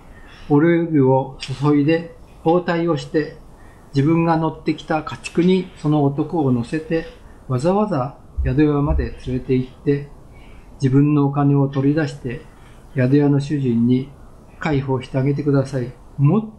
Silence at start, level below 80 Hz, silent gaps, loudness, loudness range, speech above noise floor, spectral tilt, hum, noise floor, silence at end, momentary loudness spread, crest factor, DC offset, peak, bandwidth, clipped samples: 0.05 s; -36 dBFS; none; -19 LUFS; 2 LU; 24 dB; -8.5 dB/octave; none; -42 dBFS; 0 s; 10 LU; 14 dB; under 0.1%; -6 dBFS; 9.8 kHz; under 0.1%